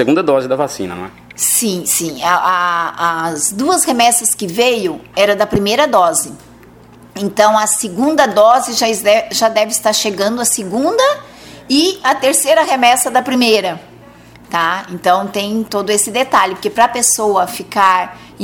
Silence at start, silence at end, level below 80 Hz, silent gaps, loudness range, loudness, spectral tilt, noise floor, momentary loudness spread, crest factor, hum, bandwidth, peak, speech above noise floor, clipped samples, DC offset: 0 s; 0 s; -50 dBFS; none; 3 LU; -13 LUFS; -2 dB/octave; -40 dBFS; 8 LU; 14 dB; none; over 20 kHz; 0 dBFS; 27 dB; under 0.1%; under 0.1%